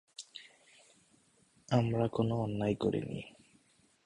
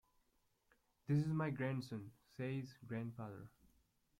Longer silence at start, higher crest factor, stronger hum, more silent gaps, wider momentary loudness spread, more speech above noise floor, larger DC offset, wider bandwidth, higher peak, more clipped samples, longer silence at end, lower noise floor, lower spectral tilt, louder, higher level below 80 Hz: second, 0.2 s vs 1.1 s; about the same, 20 dB vs 18 dB; neither; neither; about the same, 18 LU vs 19 LU; about the same, 36 dB vs 38 dB; neither; second, 11 kHz vs 12.5 kHz; first, -16 dBFS vs -28 dBFS; neither; about the same, 0.75 s vs 0.7 s; second, -69 dBFS vs -80 dBFS; about the same, -7.5 dB/octave vs -8 dB/octave; first, -34 LUFS vs -43 LUFS; first, -64 dBFS vs -76 dBFS